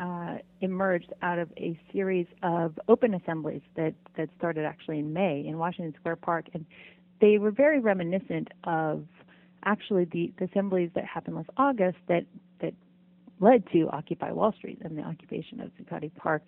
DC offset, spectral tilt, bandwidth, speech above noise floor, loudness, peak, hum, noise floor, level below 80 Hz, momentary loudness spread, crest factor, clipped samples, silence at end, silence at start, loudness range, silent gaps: under 0.1%; -10.5 dB/octave; 4 kHz; 31 dB; -29 LUFS; -6 dBFS; none; -59 dBFS; -70 dBFS; 15 LU; 22 dB; under 0.1%; 0.1 s; 0 s; 4 LU; none